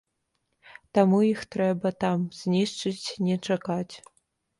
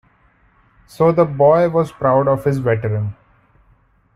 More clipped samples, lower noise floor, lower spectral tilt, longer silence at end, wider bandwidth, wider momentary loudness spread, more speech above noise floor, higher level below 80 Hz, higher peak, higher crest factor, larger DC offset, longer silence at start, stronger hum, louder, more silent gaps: neither; first, -77 dBFS vs -55 dBFS; second, -6.5 dB/octave vs -9 dB/octave; second, 0.6 s vs 1 s; second, 11.5 kHz vs 13.5 kHz; about the same, 10 LU vs 8 LU; first, 52 dB vs 40 dB; second, -66 dBFS vs -50 dBFS; second, -8 dBFS vs -2 dBFS; about the same, 18 dB vs 16 dB; neither; second, 0.7 s vs 1 s; neither; second, -26 LUFS vs -16 LUFS; neither